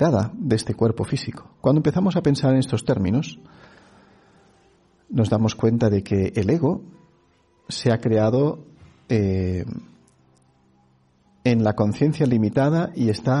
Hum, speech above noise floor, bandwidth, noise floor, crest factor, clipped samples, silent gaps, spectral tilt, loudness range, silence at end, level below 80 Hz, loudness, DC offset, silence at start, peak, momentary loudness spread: none; 40 dB; 11.5 kHz; -60 dBFS; 16 dB; under 0.1%; none; -7.5 dB/octave; 3 LU; 0 s; -52 dBFS; -21 LUFS; under 0.1%; 0 s; -6 dBFS; 8 LU